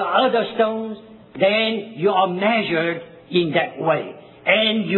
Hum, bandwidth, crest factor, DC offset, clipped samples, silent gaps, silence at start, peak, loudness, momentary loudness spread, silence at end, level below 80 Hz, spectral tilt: none; 4.3 kHz; 18 dB; under 0.1%; under 0.1%; none; 0 s; -2 dBFS; -20 LUFS; 13 LU; 0 s; -68 dBFS; -8.5 dB/octave